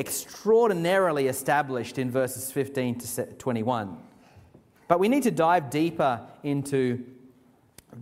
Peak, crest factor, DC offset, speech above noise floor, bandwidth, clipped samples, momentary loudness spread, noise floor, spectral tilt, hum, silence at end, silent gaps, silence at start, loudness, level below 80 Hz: -6 dBFS; 22 dB; under 0.1%; 33 dB; 16 kHz; under 0.1%; 10 LU; -59 dBFS; -5 dB/octave; none; 0 s; none; 0 s; -26 LUFS; -66 dBFS